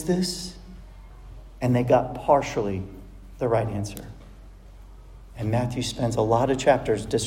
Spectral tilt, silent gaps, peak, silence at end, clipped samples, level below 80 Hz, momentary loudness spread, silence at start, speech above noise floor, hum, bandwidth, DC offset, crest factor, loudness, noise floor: -6 dB/octave; none; -4 dBFS; 0 s; under 0.1%; -44 dBFS; 19 LU; 0 s; 21 dB; none; 16 kHz; under 0.1%; 22 dB; -24 LUFS; -45 dBFS